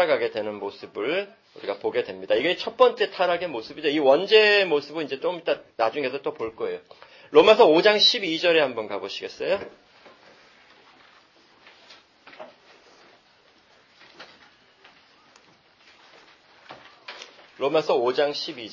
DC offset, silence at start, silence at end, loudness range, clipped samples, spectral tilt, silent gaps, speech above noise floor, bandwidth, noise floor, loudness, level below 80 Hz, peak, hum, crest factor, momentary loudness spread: under 0.1%; 0 s; 0 s; 13 LU; under 0.1%; -4 dB/octave; none; 36 dB; 7.4 kHz; -58 dBFS; -22 LUFS; -70 dBFS; -2 dBFS; none; 22 dB; 18 LU